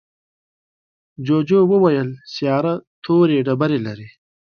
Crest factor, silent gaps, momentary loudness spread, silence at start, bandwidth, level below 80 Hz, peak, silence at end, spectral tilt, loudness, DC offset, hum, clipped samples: 16 dB; 2.87-3.02 s; 13 LU; 1.2 s; 6.8 kHz; -62 dBFS; -4 dBFS; 0.45 s; -8.5 dB/octave; -18 LUFS; under 0.1%; none; under 0.1%